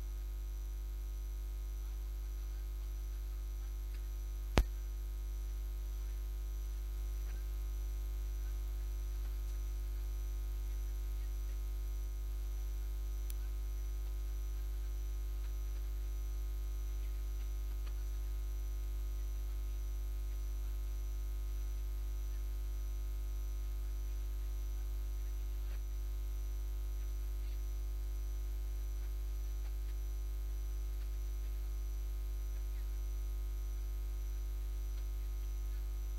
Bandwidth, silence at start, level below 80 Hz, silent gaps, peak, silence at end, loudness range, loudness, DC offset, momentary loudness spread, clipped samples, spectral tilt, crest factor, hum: 16 kHz; 0 s; -38 dBFS; none; -6 dBFS; 0 s; 1 LU; -43 LUFS; under 0.1%; 2 LU; under 0.1%; -5.5 dB/octave; 32 dB; 50 Hz at -40 dBFS